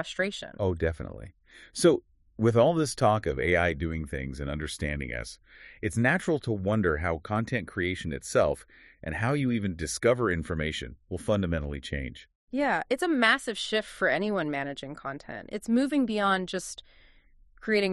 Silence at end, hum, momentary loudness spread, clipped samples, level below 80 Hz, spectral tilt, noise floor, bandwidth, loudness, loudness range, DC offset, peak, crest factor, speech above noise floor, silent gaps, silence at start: 0 s; none; 13 LU; under 0.1%; -46 dBFS; -5.5 dB/octave; -58 dBFS; 12 kHz; -28 LUFS; 4 LU; under 0.1%; -6 dBFS; 22 dB; 30 dB; 12.35-12.47 s; 0 s